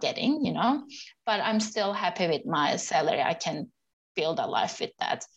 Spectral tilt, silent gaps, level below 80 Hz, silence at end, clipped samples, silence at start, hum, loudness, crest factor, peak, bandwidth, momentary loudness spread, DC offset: -4 dB/octave; 3.93-4.15 s; -72 dBFS; 0.1 s; under 0.1%; 0 s; none; -28 LUFS; 16 dB; -12 dBFS; 9 kHz; 8 LU; under 0.1%